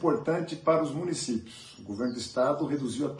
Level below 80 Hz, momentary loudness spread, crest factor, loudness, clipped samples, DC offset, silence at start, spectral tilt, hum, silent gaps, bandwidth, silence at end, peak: -68 dBFS; 10 LU; 18 dB; -29 LUFS; under 0.1%; under 0.1%; 0 s; -5.5 dB/octave; none; none; 11.5 kHz; 0 s; -12 dBFS